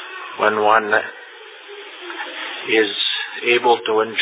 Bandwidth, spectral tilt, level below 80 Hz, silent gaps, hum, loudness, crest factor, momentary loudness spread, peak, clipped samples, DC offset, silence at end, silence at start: 4 kHz; -6.5 dB/octave; -76 dBFS; none; none; -18 LUFS; 20 dB; 20 LU; 0 dBFS; under 0.1%; under 0.1%; 0 s; 0 s